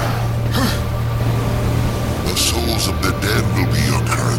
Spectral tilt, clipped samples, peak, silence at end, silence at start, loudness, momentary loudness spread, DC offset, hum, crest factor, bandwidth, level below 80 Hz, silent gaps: -4.5 dB/octave; under 0.1%; -2 dBFS; 0 s; 0 s; -18 LUFS; 4 LU; under 0.1%; none; 14 dB; 16.5 kHz; -28 dBFS; none